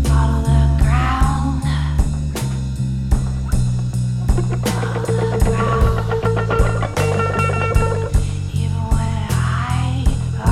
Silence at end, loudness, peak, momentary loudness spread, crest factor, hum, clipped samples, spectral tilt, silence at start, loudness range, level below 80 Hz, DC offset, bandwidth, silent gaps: 0 s; -19 LUFS; -2 dBFS; 5 LU; 14 dB; none; under 0.1%; -6.5 dB/octave; 0 s; 2 LU; -22 dBFS; under 0.1%; 14 kHz; none